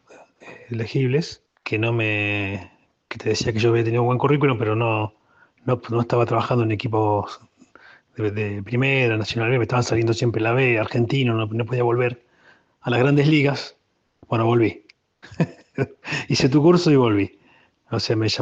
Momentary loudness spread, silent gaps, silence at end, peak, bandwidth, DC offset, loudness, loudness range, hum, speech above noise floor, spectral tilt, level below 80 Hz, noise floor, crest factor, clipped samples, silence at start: 12 LU; none; 0 s; -4 dBFS; 8 kHz; under 0.1%; -21 LUFS; 3 LU; none; 37 dB; -6.5 dB/octave; -56 dBFS; -57 dBFS; 18 dB; under 0.1%; 0.45 s